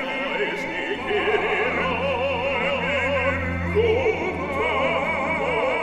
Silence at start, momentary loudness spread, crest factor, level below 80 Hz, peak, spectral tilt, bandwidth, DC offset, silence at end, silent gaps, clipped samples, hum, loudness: 0 s; 4 LU; 14 dB; -44 dBFS; -10 dBFS; -5.5 dB/octave; 12 kHz; under 0.1%; 0 s; none; under 0.1%; none; -23 LUFS